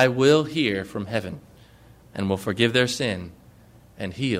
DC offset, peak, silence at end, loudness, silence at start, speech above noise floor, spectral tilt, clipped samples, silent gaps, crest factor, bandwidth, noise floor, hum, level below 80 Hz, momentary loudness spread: under 0.1%; -6 dBFS; 0 s; -23 LUFS; 0 s; 28 dB; -5 dB/octave; under 0.1%; none; 18 dB; 16 kHz; -51 dBFS; none; -58 dBFS; 19 LU